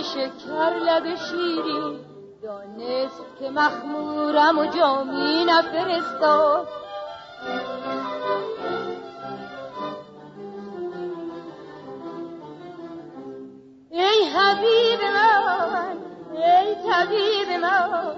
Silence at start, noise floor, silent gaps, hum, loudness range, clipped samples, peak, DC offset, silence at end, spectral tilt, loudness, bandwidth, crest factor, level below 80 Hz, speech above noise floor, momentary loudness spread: 0 s; -44 dBFS; none; none; 15 LU; under 0.1%; -6 dBFS; under 0.1%; 0 s; -4 dB/octave; -22 LUFS; 7.8 kHz; 16 dB; -66 dBFS; 22 dB; 20 LU